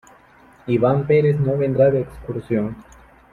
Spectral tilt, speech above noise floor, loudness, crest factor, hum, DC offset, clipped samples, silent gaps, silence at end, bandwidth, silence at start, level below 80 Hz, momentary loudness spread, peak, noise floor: -9.5 dB/octave; 31 dB; -19 LUFS; 16 dB; none; under 0.1%; under 0.1%; none; 0.5 s; 7.4 kHz; 0.65 s; -48 dBFS; 14 LU; -4 dBFS; -50 dBFS